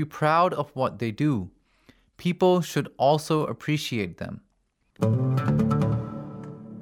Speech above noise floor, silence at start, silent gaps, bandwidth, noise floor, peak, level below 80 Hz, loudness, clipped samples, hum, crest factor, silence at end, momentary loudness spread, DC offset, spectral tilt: 46 dB; 0 s; none; 17.5 kHz; -70 dBFS; -8 dBFS; -54 dBFS; -25 LUFS; under 0.1%; none; 18 dB; 0 s; 16 LU; under 0.1%; -7 dB/octave